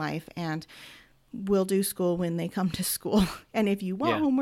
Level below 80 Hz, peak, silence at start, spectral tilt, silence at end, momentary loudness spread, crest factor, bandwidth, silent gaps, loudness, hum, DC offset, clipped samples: -52 dBFS; -12 dBFS; 0 s; -5.5 dB/octave; 0 s; 13 LU; 16 dB; 16.5 kHz; none; -28 LUFS; none; under 0.1%; under 0.1%